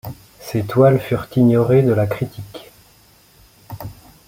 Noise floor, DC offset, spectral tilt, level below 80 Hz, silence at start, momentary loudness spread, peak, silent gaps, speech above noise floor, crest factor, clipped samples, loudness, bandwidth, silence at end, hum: -51 dBFS; under 0.1%; -8.5 dB/octave; -50 dBFS; 0.05 s; 22 LU; -2 dBFS; none; 36 dB; 16 dB; under 0.1%; -17 LUFS; 16.5 kHz; 0.35 s; none